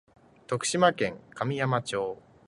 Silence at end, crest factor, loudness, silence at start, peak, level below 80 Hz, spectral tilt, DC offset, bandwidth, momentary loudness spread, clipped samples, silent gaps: 0.35 s; 22 dB; -28 LUFS; 0.5 s; -8 dBFS; -64 dBFS; -4.5 dB/octave; under 0.1%; 11.5 kHz; 10 LU; under 0.1%; none